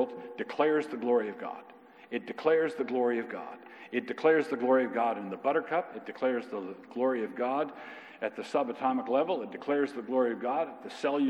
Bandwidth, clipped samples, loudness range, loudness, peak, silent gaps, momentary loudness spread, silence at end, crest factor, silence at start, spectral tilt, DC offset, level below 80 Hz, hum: 10 kHz; under 0.1%; 3 LU; -31 LUFS; -12 dBFS; none; 13 LU; 0 s; 18 dB; 0 s; -6 dB/octave; under 0.1%; under -90 dBFS; none